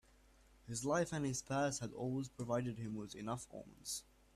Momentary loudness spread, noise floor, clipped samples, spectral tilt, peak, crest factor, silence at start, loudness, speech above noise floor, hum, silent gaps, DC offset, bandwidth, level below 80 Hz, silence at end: 9 LU; -67 dBFS; under 0.1%; -5 dB/octave; -24 dBFS; 18 dB; 0.65 s; -42 LUFS; 26 dB; none; none; under 0.1%; 14.5 kHz; -68 dBFS; 0.35 s